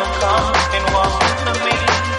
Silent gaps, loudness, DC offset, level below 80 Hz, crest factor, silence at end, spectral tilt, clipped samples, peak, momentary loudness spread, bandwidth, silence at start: none; -16 LUFS; under 0.1%; -28 dBFS; 16 dB; 0 s; -3.5 dB/octave; under 0.1%; -2 dBFS; 2 LU; 11 kHz; 0 s